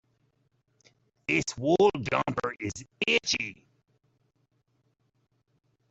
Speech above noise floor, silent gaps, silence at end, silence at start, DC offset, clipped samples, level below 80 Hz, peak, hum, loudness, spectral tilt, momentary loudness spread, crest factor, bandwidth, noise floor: 45 dB; none; 2.35 s; 1.3 s; under 0.1%; under 0.1%; -62 dBFS; -10 dBFS; none; -27 LUFS; -4 dB/octave; 14 LU; 22 dB; 8.2 kHz; -73 dBFS